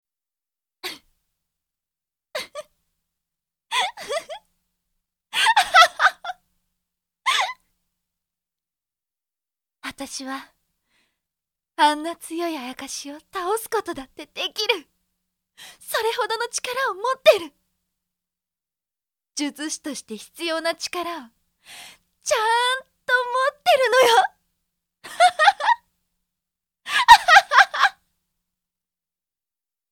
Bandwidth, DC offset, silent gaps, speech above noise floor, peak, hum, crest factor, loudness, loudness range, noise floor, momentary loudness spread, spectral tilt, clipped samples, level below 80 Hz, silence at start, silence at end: 17.5 kHz; under 0.1%; none; over 68 dB; 0 dBFS; none; 24 dB; -20 LUFS; 14 LU; under -90 dBFS; 21 LU; 0 dB/octave; under 0.1%; -60 dBFS; 0.85 s; 2 s